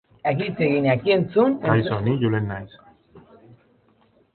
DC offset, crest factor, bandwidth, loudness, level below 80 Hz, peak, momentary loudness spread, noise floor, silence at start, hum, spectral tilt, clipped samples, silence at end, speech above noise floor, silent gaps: under 0.1%; 20 dB; 4.5 kHz; -21 LUFS; -54 dBFS; -4 dBFS; 9 LU; -60 dBFS; 0.25 s; none; -12 dB/octave; under 0.1%; 1.15 s; 39 dB; none